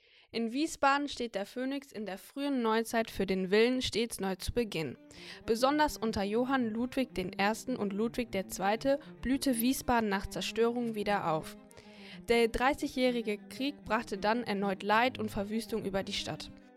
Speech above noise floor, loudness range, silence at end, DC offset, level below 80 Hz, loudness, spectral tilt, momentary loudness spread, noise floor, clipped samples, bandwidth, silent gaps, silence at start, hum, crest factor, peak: 20 dB; 1 LU; 0.15 s; under 0.1%; -54 dBFS; -32 LUFS; -4.5 dB/octave; 10 LU; -52 dBFS; under 0.1%; 16 kHz; none; 0.35 s; none; 20 dB; -14 dBFS